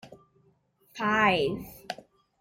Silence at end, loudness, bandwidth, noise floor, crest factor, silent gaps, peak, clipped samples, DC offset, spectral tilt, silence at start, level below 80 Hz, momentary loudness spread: 0.45 s; -26 LUFS; 16.5 kHz; -66 dBFS; 20 dB; none; -10 dBFS; under 0.1%; under 0.1%; -5 dB/octave; 0.05 s; -60 dBFS; 18 LU